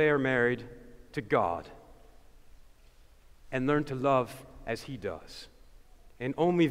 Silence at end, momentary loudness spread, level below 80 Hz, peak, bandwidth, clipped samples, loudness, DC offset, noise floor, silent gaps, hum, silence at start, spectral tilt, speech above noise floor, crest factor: 0 s; 21 LU; -56 dBFS; -12 dBFS; 15.5 kHz; under 0.1%; -31 LUFS; under 0.1%; -57 dBFS; none; none; 0 s; -7 dB/octave; 28 dB; 18 dB